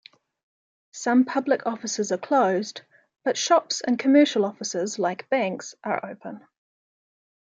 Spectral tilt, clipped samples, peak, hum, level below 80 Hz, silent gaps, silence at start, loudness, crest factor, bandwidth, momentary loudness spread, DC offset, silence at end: -3.5 dB/octave; under 0.1%; -6 dBFS; none; -80 dBFS; none; 0.95 s; -24 LUFS; 18 dB; 9.2 kHz; 17 LU; under 0.1%; 1.1 s